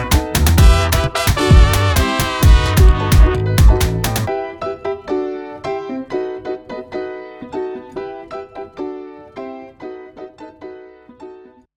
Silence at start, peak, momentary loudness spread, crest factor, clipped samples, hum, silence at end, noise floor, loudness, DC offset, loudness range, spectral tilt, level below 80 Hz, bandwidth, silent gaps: 0 s; 0 dBFS; 21 LU; 14 dB; under 0.1%; none; 0.4 s; -40 dBFS; -16 LUFS; under 0.1%; 18 LU; -5.5 dB/octave; -18 dBFS; 20 kHz; none